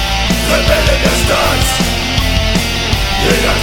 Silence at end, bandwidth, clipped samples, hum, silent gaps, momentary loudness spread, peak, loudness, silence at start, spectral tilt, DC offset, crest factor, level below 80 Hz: 0 s; 18 kHz; under 0.1%; none; none; 3 LU; 0 dBFS; -12 LUFS; 0 s; -3.5 dB/octave; under 0.1%; 12 dB; -18 dBFS